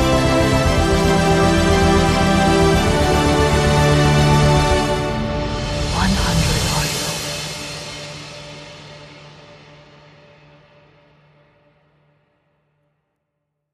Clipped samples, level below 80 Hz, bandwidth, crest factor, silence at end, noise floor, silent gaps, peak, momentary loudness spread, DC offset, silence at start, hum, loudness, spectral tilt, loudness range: under 0.1%; -28 dBFS; 15 kHz; 16 dB; 4.45 s; -75 dBFS; none; -2 dBFS; 17 LU; under 0.1%; 0 s; none; -16 LUFS; -5 dB/octave; 17 LU